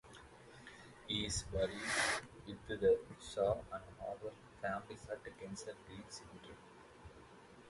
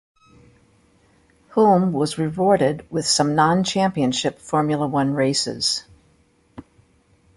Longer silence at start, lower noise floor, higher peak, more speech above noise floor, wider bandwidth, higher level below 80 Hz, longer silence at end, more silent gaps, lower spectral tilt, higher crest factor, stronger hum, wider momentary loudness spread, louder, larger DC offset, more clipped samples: second, 0.05 s vs 1.55 s; about the same, -60 dBFS vs -59 dBFS; second, -20 dBFS vs -4 dBFS; second, 19 dB vs 40 dB; about the same, 11.5 kHz vs 11.5 kHz; about the same, -60 dBFS vs -56 dBFS; second, 0 s vs 0.75 s; neither; second, -3 dB/octave vs -4.5 dB/octave; about the same, 22 dB vs 18 dB; neither; first, 23 LU vs 6 LU; second, -40 LUFS vs -20 LUFS; neither; neither